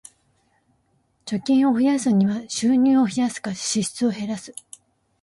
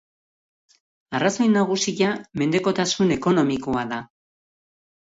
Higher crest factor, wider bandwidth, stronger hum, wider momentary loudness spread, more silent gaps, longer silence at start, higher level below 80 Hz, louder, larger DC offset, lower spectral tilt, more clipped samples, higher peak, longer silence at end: about the same, 12 dB vs 16 dB; first, 11.5 kHz vs 8 kHz; neither; first, 13 LU vs 7 LU; neither; first, 1.25 s vs 1.1 s; second, -64 dBFS vs -58 dBFS; about the same, -21 LUFS vs -22 LUFS; neither; about the same, -5 dB/octave vs -4.5 dB/octave; neither; about the same, -10 dBFS vs -8 dBFS; second, 0.7 s vs 0.95 s